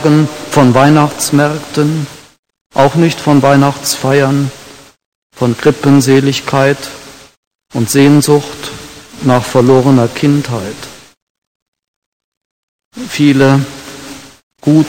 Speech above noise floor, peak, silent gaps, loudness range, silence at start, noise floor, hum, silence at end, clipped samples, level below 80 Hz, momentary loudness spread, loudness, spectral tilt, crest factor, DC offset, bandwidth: 21 dB; 0 dBFS; 2.39-2.43 s, 2.61-2.70 s, 5.06-5.30 s, 7.37-7.59 s, 11.17-11.73 s, 11.88-12.79 s, 12.85-12.91 s, 14.43-14.51 s; 5 LU; 0 s; -31 dBFS; none; 0 s; 0.7%; -46 dBFS; 20 LU; -10 LUFS; -6 dB/octave; 12 dB; under 0.1%; 17 kHz